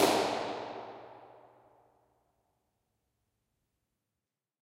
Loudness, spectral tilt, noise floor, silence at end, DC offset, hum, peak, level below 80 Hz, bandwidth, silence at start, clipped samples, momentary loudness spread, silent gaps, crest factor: -34 LUFS; -3 dB/octave; -90 dBFS; 3.35 s; under 0.1%; none; -12 dBFS; -74 dBFS; 16 kHz; 0 s; under 0.1%; 25 LU; none; 26 dB